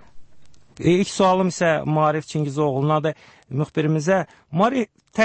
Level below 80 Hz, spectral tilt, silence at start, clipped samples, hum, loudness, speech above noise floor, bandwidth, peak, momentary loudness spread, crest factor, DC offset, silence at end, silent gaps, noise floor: -56 dBFS; -6 dB/octave; 0.15 s; under 0.1%; none; -21 LUFS; 27 dB; 8.8 kHz; -6 dBFS; 9 LU; 14 dB; under 0.1%; 0 s; none; -47 dBFS